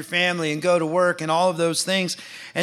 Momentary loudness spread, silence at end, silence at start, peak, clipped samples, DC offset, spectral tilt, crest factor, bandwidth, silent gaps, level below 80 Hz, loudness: 7 LU; 0 s; 0 s; -6 dBFS; under 0.1%; under 0.1%; -3.5 dB/octave; 16 dB; 14 kHz; none; -68 dBFS; -21 LUFS